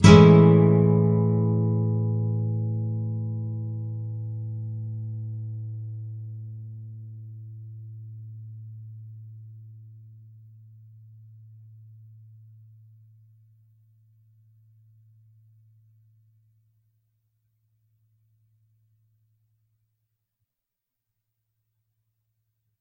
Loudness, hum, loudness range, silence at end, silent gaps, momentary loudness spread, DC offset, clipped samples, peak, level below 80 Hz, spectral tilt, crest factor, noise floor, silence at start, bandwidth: -23 LUFS; none; 27 LU; 13 s; none; 25 LU; under 0.1%; under 0.1%; 0 dBFS; -54 dBFS; -8 dB/octave; 26 dB; -86 dBFS; 0 s; 10 kHz